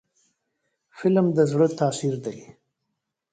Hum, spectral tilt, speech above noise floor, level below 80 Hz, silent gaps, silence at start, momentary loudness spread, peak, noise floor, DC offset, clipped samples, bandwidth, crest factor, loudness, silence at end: none; -7 dB/octave; 58 dB; -66 dBFS; none; 0.95 s; 14 LU; -8 dBFS; -80 dBFS; under 0.1%; under 0.1%; 9.4 kHz; 18 dB; -23 LUFS; 0.9 s